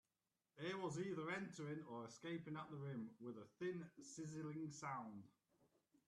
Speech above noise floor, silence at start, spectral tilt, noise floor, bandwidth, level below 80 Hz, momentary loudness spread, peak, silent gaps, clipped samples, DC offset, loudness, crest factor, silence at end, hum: over 39 dB; 0.55 s; -5.5 dB/octave; under -90 dBFS; 12 kHz; -88 dBFS; 8 LU; -34 dBFS; none; under 0.1%; under 0.1%; -51 LUFS; 18 dB; 0.8 s; none